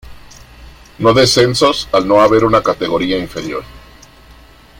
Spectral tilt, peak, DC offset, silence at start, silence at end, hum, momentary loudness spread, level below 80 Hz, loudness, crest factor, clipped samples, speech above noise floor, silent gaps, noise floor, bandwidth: -4.5 dB/octave; 0 dBFS; under 0.1%; 0.05 s; 1 s; none; 13 LU; -40 dBFS; -12 LUFS; 14 dB; under 0.1%; 29 dB; none; -41 dBFS; 16.5 kHz